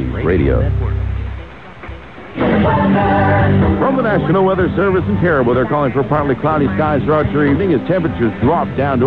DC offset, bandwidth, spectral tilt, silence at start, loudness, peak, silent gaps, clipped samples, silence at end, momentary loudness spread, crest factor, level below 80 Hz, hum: 0.8%; 5 kHz; -10 dB/octave; 0 s; -14 LUFS; -2 dBFS; none; under 0.1%; 0 s; 13 LU; 12 dB; -28 dBFS; none